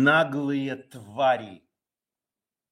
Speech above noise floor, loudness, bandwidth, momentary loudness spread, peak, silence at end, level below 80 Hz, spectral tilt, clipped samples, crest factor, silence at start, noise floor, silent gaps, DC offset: over 66 dB; -25 LUFS; 12 kHz; 17 LU; -8 dBFS; 1.15 s; -78 dBFS; -6.5 dB/octave; under 0.1%; 20 dB; 0 s; under -90 dBFS; none; under 0.1%